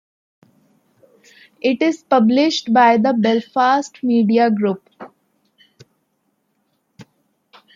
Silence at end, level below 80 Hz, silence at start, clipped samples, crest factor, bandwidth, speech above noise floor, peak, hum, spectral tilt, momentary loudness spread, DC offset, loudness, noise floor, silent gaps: 0.7 s; -72 dBFS; 1.65 s; under 0.1%; 16 dB; 7.6 kHz; 52 dB; -2 dBFS; none; -5.5 dB/octave; 8 LU; under 0.1%; -16 LUFS; -68 dBFS; none